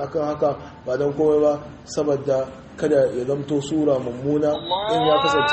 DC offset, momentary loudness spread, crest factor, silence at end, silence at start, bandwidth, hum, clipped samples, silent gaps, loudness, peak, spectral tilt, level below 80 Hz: under 0.1%; 9 LU; 14 dB; 0 s; 0 s; 8.4 kHz; none; under 0.1%; none; -21 LUFS; -6 dBFS; -5.5 dB/octave; -52 dBFS